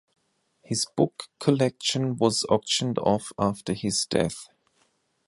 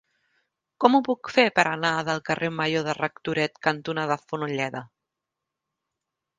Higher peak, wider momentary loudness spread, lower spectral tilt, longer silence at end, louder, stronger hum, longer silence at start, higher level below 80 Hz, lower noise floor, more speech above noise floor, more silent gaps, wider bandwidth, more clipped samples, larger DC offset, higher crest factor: second, -6 dBFS vs -2 dBFS; second, 5 LU vs 8 LU; about the same, -4.5 dB/octave vs -5 dB/octave; second, 0.85 s vs 1.55 s; about the same, -25 LUFS vs -24 LUFS; neither; about the same, 0.7 s vs 0.8 s; first, -58 dBFS vs -68 dBFS; second, -69 dBFS vs -85 dBFS; second, 44 dB vs 61 dB; neither; first, 11.5 kHz vs 9.6 kHz; neither; neither; about the same, 20 dB vs 24 dB